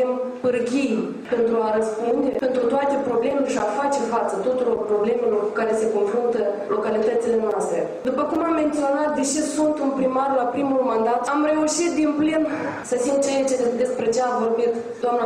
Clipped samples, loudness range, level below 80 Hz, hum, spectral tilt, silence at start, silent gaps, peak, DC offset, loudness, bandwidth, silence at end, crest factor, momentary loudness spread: under 0.1%; 1 LU; -60 dBFS; none; -4.5 dB/octave; 0 s; none; -10 dBFS; under 0.1%; -22 LUFS; 12.5 kHz; 0 s; 10 dB; 3 LU